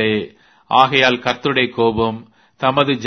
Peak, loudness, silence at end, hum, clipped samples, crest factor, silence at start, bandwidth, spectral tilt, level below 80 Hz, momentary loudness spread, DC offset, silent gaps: 0 dBFS; -16 LUFS; 0 s; none; under 0.1%; 18 dB; 0 s; 6.6 kHz; -5.5 dB/octave; -48 dBFS; 10 LU; under 0.1%; none